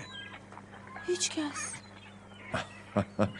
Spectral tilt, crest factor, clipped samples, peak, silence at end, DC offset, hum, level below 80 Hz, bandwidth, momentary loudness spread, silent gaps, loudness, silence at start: -3.5 dB/octave; 24 dB; under 0.1%; -12 dBFS; 0 s; under 0.1%; 50 Hz at -55 dBFS; -64 dBFS; 11.5 kHz; 18 LU; none; -35 LUFS; 0 s